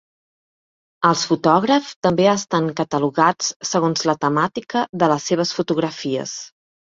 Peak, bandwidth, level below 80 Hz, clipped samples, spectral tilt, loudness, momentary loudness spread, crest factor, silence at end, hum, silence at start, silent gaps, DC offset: -2 dBFS; 7.8 kHz; -60 dBFS; under 0.1%; -4.5 dB/octave; -19 LUFS; 7 LU; 18 dB; 0.45 s; none; 1 s; 1.96-2.02 s, 3.56-3.60 s, 4.89-4.93 s; under 0.1%